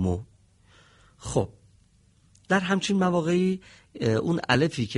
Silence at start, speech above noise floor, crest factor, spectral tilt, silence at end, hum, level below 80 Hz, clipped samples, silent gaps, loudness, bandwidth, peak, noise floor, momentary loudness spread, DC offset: 0 s; 36 dB; 22 dB; -5.5 dB/octave; 0 s; none; -52 dBFS; under 0.1%; none; -26 LUFS; 11.5 kHz; -6 dBFS; -61 dBFS; 12 LU; under 0.1%